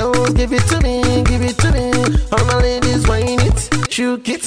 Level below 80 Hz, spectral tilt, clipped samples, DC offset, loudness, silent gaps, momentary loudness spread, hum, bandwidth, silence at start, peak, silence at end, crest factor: -20 dBFS; -5 dB/octave; under 0.1%; 2%; -15 LUFS; none; 3 LU; none; 13.5 kHz; 0 s; -6 dBFS; 0 s; 10 dB